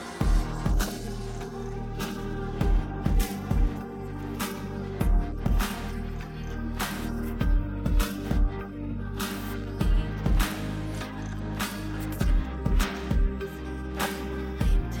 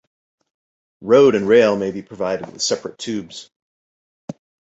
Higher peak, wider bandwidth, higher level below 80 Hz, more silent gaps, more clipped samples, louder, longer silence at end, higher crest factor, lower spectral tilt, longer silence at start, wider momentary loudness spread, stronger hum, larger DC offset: second, -10 dBFS vs -2 dBFS; first, 17.5 kHz vs 8.2 kHz; first, -28 dBFS vs -60 dBFS; second, none vs 3.56-4.28 s; neither; second, -31 LUFS vs -18 LUFS; second, 0 s vs 0.4 s; about the same, 16 dB vs 18 dB; about the same, -5.5 dB/octave vs -4.5 dB/octave; second, 0 s vs 1 s; second, 7 LU vs 24 LU; neither; neither